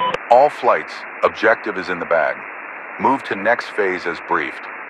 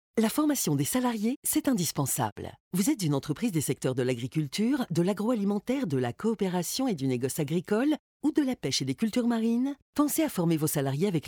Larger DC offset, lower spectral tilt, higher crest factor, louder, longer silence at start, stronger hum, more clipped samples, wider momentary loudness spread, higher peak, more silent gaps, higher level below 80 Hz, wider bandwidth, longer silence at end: neither; about the same, -5 dB/octave vs -5 dB/octave; about the same, 18 dB vs 16 dB; first, -18 LUFS vs -28 LUFS; second, 0 s vs 0.15 s; neither; neither; first, 14 LU vs 4 LU; first, 0 dBFS vs -12 dBFS; second, none vs 1.36-1.42 s, 2.32-2.36 s, 2.60-2.71 s, 7.99-8.20 s, 9.82-9.93 s; about the same, -62 dBFS vs -64 dBFS; second, 10.5 kHz vs over 20 kHz; about the same, 0 s vs 0 s